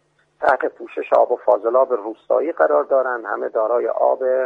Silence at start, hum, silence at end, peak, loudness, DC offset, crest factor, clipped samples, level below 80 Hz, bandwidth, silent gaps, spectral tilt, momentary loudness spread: 0.4 s; none; 0 s; -2 dBFS; -19 LUFS; under 0.1%; 16 dB; under 0.1%; -68 dBFS; 5.2 kHz; none; -6 dB/octave; 7 LU